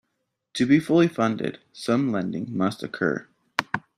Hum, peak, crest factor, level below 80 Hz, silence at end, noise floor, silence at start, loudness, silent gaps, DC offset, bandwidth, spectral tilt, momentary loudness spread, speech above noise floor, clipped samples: none; -2 dBFS; 24 dB; -64 dBFS; 0.2 s; -78 dBFS; 0.55 s; -24 LUFS; none; under 0.1%; 13 kHz; -6.5 dB/octave; 12 LU; 55 dB; under 0.1%